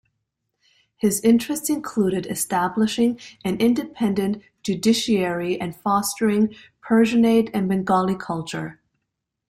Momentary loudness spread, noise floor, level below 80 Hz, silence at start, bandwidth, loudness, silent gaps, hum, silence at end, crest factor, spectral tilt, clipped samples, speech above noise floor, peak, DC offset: 10 LU; -80 dBFS; -58 dBFS; 1.05 s; 16 kHz; -22 LUFS; none; none; 0.75 s; 16 dB; -5 dB/octave; under 0.1%; 59 dB; -6 dBFS; under 0.1%